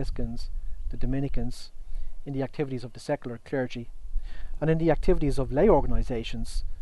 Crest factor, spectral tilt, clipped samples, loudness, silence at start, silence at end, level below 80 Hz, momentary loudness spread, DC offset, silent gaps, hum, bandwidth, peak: 16 dB; -7.5 dB/octave; under 0.1%; -29 LUFS; 0 s; 0 s; -34 dBFS; 17 LU; under 0.1%; none; none; 11.5 kHz; -8 dBFS